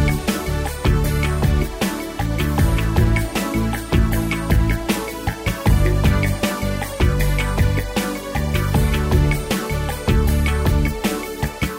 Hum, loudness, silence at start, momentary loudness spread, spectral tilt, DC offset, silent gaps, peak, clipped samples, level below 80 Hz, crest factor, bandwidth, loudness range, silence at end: none; -20 LUFS; 0 s; 6 LU; -5.5 dB/octave; under 0.1%; none; -4 dBFS; under 0.1%; -22 dBFS; 14 dB; 16.5 kHz; 0 LU; 0 s